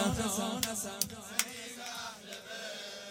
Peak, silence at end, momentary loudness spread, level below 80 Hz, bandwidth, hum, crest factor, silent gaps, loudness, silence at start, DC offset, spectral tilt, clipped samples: -8 dBFS; 0 s; 10 LU; -58 dBFS; 16.5 kHz; none; 30 dB; none; -36 LUFS; 0 s; under 0.1%; -2.5 dB/octave; under 0.1%